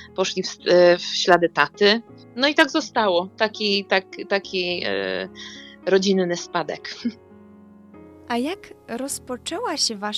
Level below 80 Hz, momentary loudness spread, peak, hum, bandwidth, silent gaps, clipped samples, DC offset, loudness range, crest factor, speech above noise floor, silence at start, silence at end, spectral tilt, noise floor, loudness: -64 dBFS; 14 LU; 0 dBFS; none; 13.5 kHz; none; under 0.1%; under 0.1%; 9 LU; 22 dB; 25 dB; 0 s; 0 s; -3.5 dB/octave; -47 dBFS; -21 LUFS